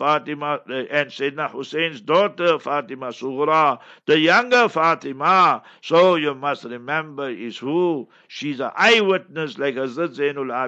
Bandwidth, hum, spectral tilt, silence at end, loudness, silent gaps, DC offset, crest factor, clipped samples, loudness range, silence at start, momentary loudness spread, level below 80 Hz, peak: 8.2 kHz; none; -4.5 dB/octave; 0 s; -20 LUFS; none; under 0.1%; 18 dB; under 0.1%; 5 LU; 0 s; 14 LU; -76 dBFS; -2 dBFS